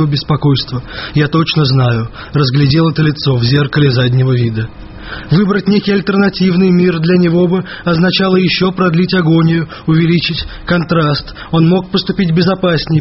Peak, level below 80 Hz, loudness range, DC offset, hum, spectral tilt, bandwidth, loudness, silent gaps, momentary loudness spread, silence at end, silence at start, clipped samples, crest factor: 0 dBFS; -36 dBFS; 2 LU; under 0.1%; none; -5.5 dB/octave; 6 kHz; -12 LUFS; none; 7 LU; 0 s; 0 s; under 0.1%; 12 dB